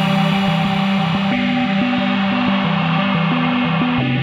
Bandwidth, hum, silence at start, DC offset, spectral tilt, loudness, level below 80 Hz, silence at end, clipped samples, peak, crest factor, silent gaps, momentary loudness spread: 11 kHz; none; 0 s; under 0.1%; -7 dB/octave; -17 LUFS; -48 dBFS; 0 s; under 0.1%; -4 dBFS; 12 dB; none; 1 LU